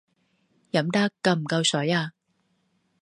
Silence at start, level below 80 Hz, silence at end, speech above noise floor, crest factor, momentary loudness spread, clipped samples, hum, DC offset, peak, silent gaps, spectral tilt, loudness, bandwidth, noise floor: 0.75 s; -72 dBFS; 0.9 s; 47 dB; 20 dB; 5 LU; under 0.1%; none; under 0.1%; -6 dBFS; none; -4.5 dB/octave; -24 LUFS; 11.5 kHz; -71 dBFS